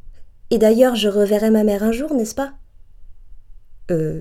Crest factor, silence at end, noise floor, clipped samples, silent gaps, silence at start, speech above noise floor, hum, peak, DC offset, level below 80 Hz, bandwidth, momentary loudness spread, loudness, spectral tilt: 18 dB; 0 s; -39 dBFS; under 0.1%; none; 0.05 s; 23 dB; none; 0 dBFS; under 0.1%; -42 dBFS; 16.5 kHz; 10 LU; -18 LUFS; -5.5 dB/octave